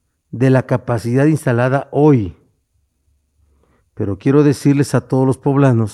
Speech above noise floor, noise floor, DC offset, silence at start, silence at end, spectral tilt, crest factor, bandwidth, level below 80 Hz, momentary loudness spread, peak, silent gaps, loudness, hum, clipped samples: 50 dB; -64 dBFS; under 0.1%; 0.35 s; 0 s; -8 dB/octave; 16 dB; 12.5 kHz; -50 dBFS; 7 LU; 0 dBFS; none; -15 LUFS; none; under 0.1%